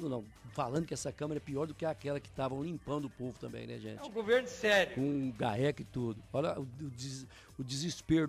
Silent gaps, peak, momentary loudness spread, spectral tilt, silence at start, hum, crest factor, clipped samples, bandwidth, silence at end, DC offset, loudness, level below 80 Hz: none; -18 dBFS; 14 LU; -5.5 dB/octave; 0 s; none; 18 dB; under 0.1%; 15.5 kHz; 0 s; under 0.1%; -36 LUFS; -62 dBFS